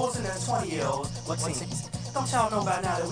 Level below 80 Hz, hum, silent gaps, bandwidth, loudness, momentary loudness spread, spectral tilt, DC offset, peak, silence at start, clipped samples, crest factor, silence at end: -50 dBFS; none; none; 10.5 kHz; -29 LUFS; 7 LU; -4.5 dB/octave; under 0.1%; -10 dBFS; 0 s; under 0.1%; 18 dB; 0 s